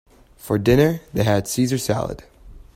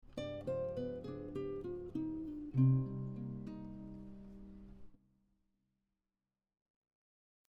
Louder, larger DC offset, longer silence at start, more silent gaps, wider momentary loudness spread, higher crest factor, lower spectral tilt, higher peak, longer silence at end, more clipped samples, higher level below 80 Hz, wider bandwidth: first, -20 LUFS vs -40 LUFS; neither; first, 0.45 s vs 0.05 s; neither; second, 9 LU vs 22 LU; about the same, 18 dB vs 20 dB; second, -6 dB/octave vs -10 dB/octave; first, -2 dBFS vs -22 dBFS; second, 0.15 s vs 2.5 s; neither; first, -42 dBFS vs -62 dBFS; first, 16.5 kHz vs 7 kHz